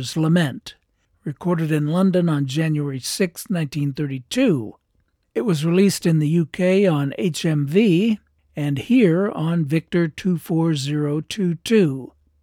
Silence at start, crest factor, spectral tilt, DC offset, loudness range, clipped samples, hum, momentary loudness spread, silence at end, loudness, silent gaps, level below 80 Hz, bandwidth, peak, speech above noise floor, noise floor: 0 s; 14 dB; -6.5 dB/octave; under 0.1%; 3 LU; under 0.1%; none; 9 LU; 0.35 s; -20 LUFS; none; -60 dBFS; 16 kHz; -6 dBFS; 47 dB; -66 dBFS